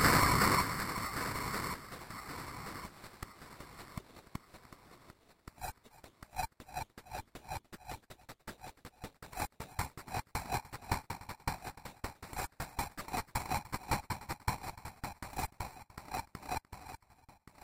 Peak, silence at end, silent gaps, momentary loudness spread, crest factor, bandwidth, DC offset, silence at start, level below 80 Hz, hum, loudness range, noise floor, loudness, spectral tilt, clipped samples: -14 dBFS; 0.15 s; none; 15 LU; 26 dB; 16.5 kHz; under 0.1%; 0 s; -52 dBFS; none; 8 LU; -64 dBFS; -38 LUFS; -3.5 dB/octave; under 0.1%